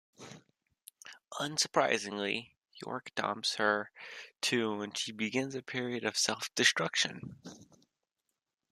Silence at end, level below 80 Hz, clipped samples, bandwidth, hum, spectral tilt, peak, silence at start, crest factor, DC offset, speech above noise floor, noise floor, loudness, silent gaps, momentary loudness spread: 1.05 s; -80 dBFS; under 0.1%; 14 kHz; none; -2 dB/octave; -10 dBFS; 0.2 s; 24 dB; under 0.1%; 53 dB; -87 dBFS; -32 LUFS; none; 23 LU